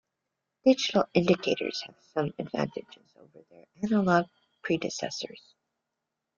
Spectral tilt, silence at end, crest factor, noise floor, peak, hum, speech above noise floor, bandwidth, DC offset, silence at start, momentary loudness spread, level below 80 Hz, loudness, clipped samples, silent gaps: -5.5 dB/octave; 1 s; 20 dB; -85 dBFS; -10 dBFS; none; 56 dB; 7.6 kHz; under 0.1%; 0.65 s; 13 LU; -68 dBFS; -28 LUFS; under 0.1%; none